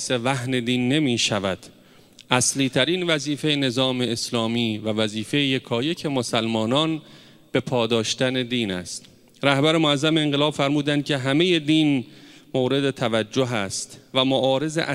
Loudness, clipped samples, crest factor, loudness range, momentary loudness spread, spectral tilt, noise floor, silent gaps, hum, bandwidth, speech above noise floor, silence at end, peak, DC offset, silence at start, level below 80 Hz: -22 LUFS; under 0.1%; 22 dB; 3 LU; 7 LU; -4 dB/octave; -50 dBFS; none; none; 14.5 kHz; 28 dB; 0 s; 0 dBFS; under 0.1%; 0 s; -62 dBFS